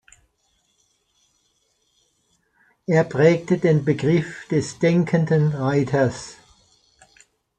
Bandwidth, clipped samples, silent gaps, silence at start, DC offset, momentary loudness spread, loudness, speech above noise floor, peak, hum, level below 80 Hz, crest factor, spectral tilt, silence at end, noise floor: 9.2 kHz; under 0.1%; none; 2.9 s; under 0.1%; 7 LU; -20 LUFS; 48 dB; -4 dBFS; none; -58 dBFS; 20 dB; -7.5 dB/octave; 1.25 s; -67 dBFS